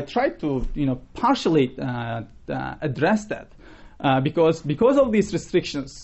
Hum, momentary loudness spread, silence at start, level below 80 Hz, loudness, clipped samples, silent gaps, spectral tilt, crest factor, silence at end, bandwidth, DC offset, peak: none; 11 LU; 0 s; -40 dBFS; -23 LUFS; under 0.1%; none; -6.5 dB/octave; 16 dB; 0 s; 8.2 kHz; 0.2%; -6 dBFS